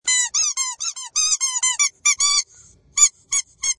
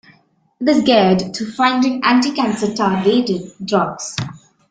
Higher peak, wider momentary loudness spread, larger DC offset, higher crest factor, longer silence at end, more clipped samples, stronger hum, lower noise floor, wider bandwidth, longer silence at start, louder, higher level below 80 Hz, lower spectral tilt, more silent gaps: about the same, 0 dBFS vs -2 dBFS; second, 8 LU vs 12 LU; neither; first, 22 dB vs 16 dB; second, 0.05 s vs 0.35 s; neither; neither; second, -51 dBFS vs -55 dBFS; first, 11.5 kHz vs 9.2 kHz; second, 0.05 s vs 0.6 s; about the same, -18 LUFS vs -16 LUFS; second, -60 dBFS vs -54 dBFS; second, 5 dB/octave vs -5 dB/octave; neither